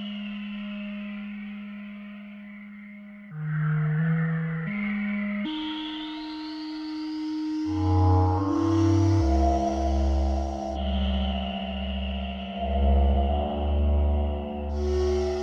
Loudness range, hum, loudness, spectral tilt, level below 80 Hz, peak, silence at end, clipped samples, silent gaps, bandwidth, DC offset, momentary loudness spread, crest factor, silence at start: 7 LU; none; -27 LUFS; -7.5 dB/octave; -30 dBFS; -10 dBFS; 0 s; under 0.1%; none; 7.2 kHz; under 0.1%; 16 LU; 16 dB; 0 s